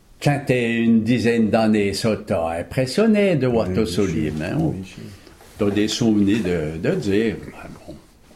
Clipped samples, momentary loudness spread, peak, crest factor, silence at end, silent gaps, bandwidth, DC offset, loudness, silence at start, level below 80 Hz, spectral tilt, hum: under 0.1%; 15 LU; -4 dBFS; 16 dB; 0.4 s; none; 14 kHz; under 0.1%; -20 LUFS; 0.2 s; -46 dBFS; -6 dB/octave; none